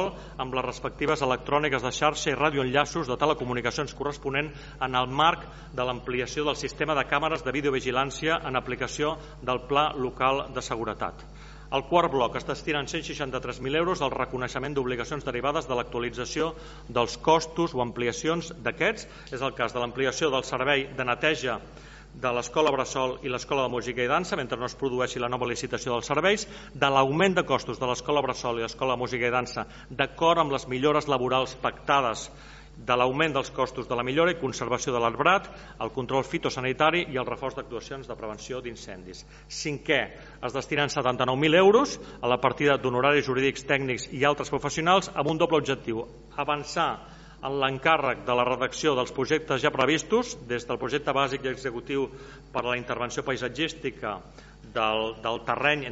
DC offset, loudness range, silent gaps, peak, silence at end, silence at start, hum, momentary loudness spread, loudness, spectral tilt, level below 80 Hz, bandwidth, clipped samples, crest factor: under 0.1%; 5 LU; none; -6 dBFS; 0 s; 0 s; none; 12 LU; -27 LUFS; -3 dB/octave; -50 dBFS; 8 kHz; under 0.1%; 22 dB